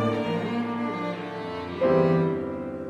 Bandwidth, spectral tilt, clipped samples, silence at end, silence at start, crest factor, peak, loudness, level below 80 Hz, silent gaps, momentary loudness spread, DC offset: 8.2 kHz; -8 dB/octave; under 0.1%; 0 s; 0 s; 16 dB; -10 dBFS; -26 LUFS; -58 dBFS; none; 12 LU; under 0.1%